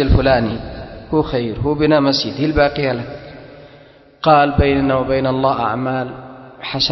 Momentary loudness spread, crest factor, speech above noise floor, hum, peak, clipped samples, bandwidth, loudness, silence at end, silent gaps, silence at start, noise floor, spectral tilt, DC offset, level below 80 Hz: 18 LU; 16 dB; 29 dB; none; 0 dBFS; under 0.1%; 6.2 kHz; -16 LUFS; 0 s; none; 0 s; -45 dBFS; -7 dB/octave; under 0.1%; -30 dBFS